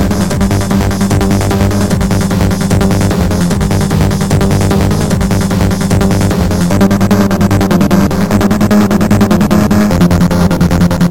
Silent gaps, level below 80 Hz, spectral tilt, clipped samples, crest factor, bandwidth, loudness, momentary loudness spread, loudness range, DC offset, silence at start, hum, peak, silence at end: none; -22 dBFS; -6.5 dB/octave; under 0.1%; 10 dB; 17 kHz; -10 LUFS; 3 LU; 2 LU; 4%; 0 s; none; 0 dBFS; 0 s